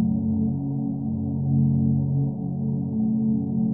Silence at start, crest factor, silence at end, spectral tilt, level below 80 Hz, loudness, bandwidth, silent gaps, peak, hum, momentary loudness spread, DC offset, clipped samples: 0 s; 12 dB; 0 s; -17 dB/octave; -50 dBFS; -24 LUFS; 1.1 kHz; none; -12 dBFS; none; 6 LU; 0.2%; under 0.1%